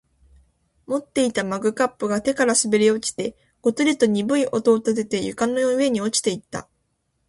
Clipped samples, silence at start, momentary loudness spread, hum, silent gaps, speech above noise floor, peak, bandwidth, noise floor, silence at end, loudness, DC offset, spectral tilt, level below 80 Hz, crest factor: under 0.1%; 0.9 s; 10 LU; none; none; 50 dB; -6 dBFS; 11.5 kHz; -71 dBFS; 0.65 s; -21 LUFS; under 0.1%; -3.5 dB/octave; -60 dBFS; 16 dB